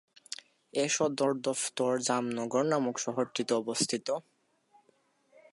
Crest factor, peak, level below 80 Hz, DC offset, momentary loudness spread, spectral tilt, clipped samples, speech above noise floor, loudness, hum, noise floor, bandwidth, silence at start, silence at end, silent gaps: 20 dB; -12 dBFS; -82 dBFS; under 0.1%; 9 LU; -3.5 dB/octave; under 0.1%; 39 dB; -31 LUFS; none; -70 dBFS; 11.5 kHz; 0.3 s; 1.3 s; none